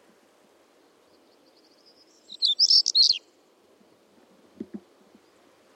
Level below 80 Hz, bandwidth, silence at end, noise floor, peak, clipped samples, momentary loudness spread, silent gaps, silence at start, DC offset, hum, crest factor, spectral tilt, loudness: under -90 dBFS; 16 kHz; 1 s; -61 dBFS; -8 dBFS; under 0.1%; 27 LU; none; 2.4 s; under 0.1%; none; 20 dB; 1 dB/octave; -19 LUFS